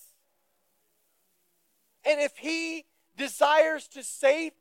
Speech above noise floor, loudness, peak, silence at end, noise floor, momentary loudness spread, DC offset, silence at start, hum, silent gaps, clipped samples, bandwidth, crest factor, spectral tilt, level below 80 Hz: 48 dB; -27 LUFS; -10 dBFS; 0.1 s; -74 dBFS; 13 LU; under 0.1%; 2.05 s; none; none; under 0.1%; 16.5 kHz; 20 dB; -0.5 dB/octave; under -90 dBFS